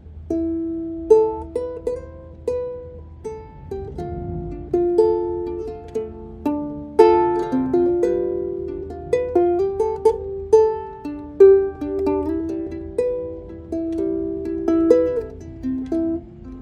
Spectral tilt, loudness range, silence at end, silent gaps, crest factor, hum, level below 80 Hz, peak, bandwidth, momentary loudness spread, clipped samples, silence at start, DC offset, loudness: -8 dB/octave; 6 LU; 0 s; none; 20 dB; none; -42 dBFS; 0 dBFS; 10 kHz; 16 LU; under 0.1%; 0.05 s; under 0.1%; -21 LUFS